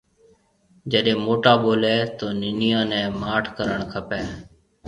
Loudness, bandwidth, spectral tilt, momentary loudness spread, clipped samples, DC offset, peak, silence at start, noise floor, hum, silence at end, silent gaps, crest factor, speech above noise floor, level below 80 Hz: -21 LUFS; 10.5 kHz; -6.5 dB/octave; 12 LU; under 0.1%; under 0.1%; -2 dBFS; 0.85 s; -59 dBFS; none; 0.4 s; none; 22 dB; 38 dB; -50 dBFS